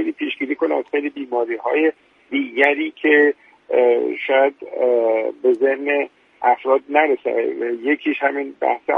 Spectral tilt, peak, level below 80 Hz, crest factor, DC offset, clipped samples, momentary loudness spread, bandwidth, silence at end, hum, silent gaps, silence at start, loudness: -5.5 dB/octave; 0 dBFS; -70 dBFS; 18 dB; under 0.1%; under 0.1%; 7 LU; 4.7 kHz; 0 s; none; none; 0 s; -19 LUFS